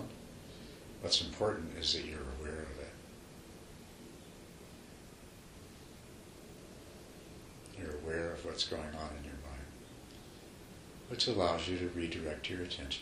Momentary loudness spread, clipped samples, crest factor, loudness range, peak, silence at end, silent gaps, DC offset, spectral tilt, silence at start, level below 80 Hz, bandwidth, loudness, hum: 20 LU; under 0.1%; 26 dB; 16 LU; -16 dBFS; 0 s; none; under 0.1%; -3.5 dB/octave; 0 s; -54 dBFS; 15.5 kHz; -37 LUFS; none